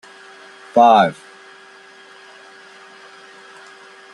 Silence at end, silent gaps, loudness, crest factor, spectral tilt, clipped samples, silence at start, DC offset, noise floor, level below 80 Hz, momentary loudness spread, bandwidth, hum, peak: 3 s; none; -14 LUFS; 20 dB; -5.5 dB/octave; under 0.1%; 0.75 s; under 0.1%; -44 dBFS; -70 dBFS; 29 LU; 11 kHz; none; -2 dBFS